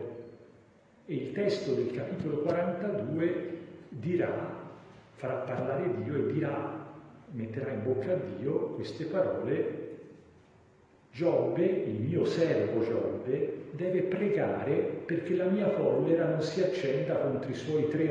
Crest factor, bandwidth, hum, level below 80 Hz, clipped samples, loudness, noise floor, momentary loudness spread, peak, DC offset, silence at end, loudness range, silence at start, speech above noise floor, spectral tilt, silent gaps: 16 dB; 9.2 kHz; none; -70 dBFS; under 0.1%; -31 LUFS; -61 dBFS; 13 LU; -14 dBFS; under 0.1%; 0 s; 5 LU; 0 s; 30 dB; -8 dB/octave; none